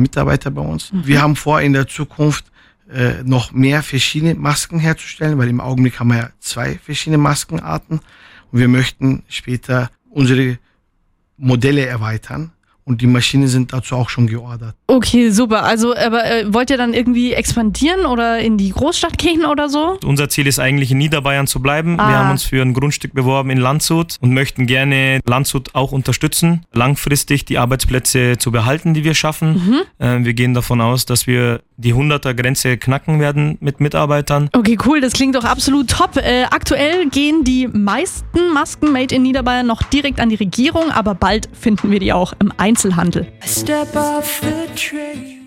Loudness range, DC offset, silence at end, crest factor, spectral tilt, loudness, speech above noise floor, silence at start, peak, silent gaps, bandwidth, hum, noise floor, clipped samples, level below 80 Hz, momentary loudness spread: 3 LU; under 0.1%; 0 s; 14 dB; -5 dB/octave; -15 LUFS; 46 dB; 0 s; 0 dBFS; none; 16.5 kHz; none; -60 dBFS; under 0.1%; -34 dBFS; 7 LU